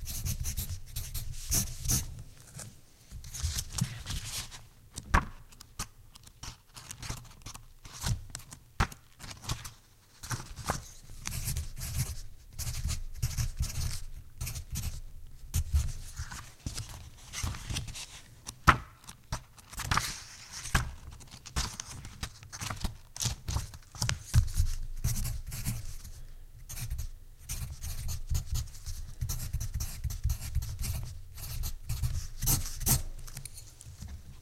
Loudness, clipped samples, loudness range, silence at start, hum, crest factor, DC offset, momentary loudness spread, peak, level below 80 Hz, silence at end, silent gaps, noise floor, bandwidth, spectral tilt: -36 LUFS; under 0.1%; 6 LU; 0 s; none; 32 dB; under 0.1%; 18 LU; -4 dBFS; -38 dBFS; 0 s; none; -58 dBFS; 16.5 kHz; -3 dB/octave